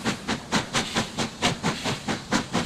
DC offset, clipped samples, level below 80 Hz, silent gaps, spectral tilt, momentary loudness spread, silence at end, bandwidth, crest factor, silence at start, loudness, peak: under 0.1%; under 0.1%; -50 dBFS; none; -3.5 dB/octave; 4 LU; 0 s; 15.5 kHz; 18 dB; 0 s; -26 LUFS; -10 dBFS